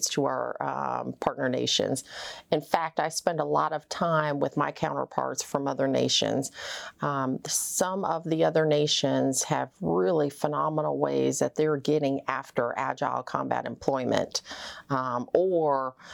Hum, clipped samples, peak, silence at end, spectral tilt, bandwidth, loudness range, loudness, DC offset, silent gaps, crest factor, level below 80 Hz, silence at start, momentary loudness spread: none; under 0.1%; -8 dBFS; 0 s; -4 dB/octave; over 20 kHz; 3 LU; -27 LUFS; under 0.1%; none; 18 dB; -66 dBFS; 0 s; 7 LU